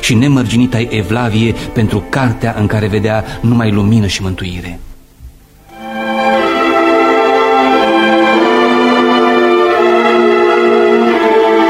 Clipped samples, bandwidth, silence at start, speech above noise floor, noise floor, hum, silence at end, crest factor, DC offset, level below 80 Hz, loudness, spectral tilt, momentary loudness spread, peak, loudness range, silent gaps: under 0.1%; 15 kHz; 0 s; 25 dB; -38 dBFS; none; 0 s; 10 dB; under 0.1%; -34 dBFS; -11 LUFS; -6 dB/octave; 6 LU; 0 dBFS; 6 LU; none